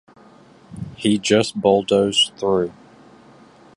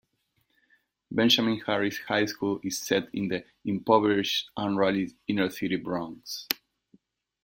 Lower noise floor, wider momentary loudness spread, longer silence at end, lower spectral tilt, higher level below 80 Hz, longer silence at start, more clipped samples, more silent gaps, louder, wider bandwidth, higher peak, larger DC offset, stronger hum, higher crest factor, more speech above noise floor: second, -48 dBFS vs -74 dBFS; about the same, 12 LU vs 11 LU; first, 1.05 s vs 0.9 s; about the same, -4 dB/octave vs -4 dB/octave; first, -54 dBFS vs -66 dBFS; second, 0.7 s vs 1.1 s; neither; neither; first, -18 LUFS vs -27 LUFS; second, 11.5 kHz vs 16.5 kHz; about the same, -2 dBFS vs 0 dBFS; neither; neither; second, 20 dB vs 28 dB; second, 30 dB vs 47 dB